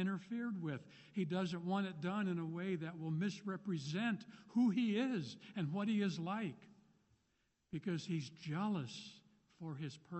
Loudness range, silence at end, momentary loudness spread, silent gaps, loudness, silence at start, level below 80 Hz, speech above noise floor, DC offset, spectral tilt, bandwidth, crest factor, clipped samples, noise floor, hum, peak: 6 LU; 0 s; 11 LU; none; -41 LUFS; 0 s; -82 dBFS; 41 dB; under 0.1%; -6.5 dB/octave; 8.2 kHz; 14 dB; under 0.1%; -81 dBFS; none; -26 dBFS